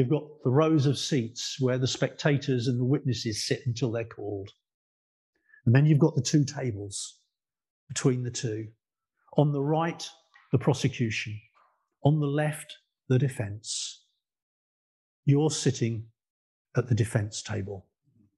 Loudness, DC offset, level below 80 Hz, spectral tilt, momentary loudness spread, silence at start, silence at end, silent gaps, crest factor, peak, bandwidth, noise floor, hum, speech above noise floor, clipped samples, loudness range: -28 LUFS; under 0.1%; -60 dBFS; -6 dB/octave; 14 LU; 0 s; 0.6 s; 4.74-5.33 s, 7.70-7.87 s, 14.42-15.23 s, 16.30-16.65 s; 20 dB; -10 dBFS; 12 kHz; -81 dBFS; none; 55 dB; under 0.1%; 4 LU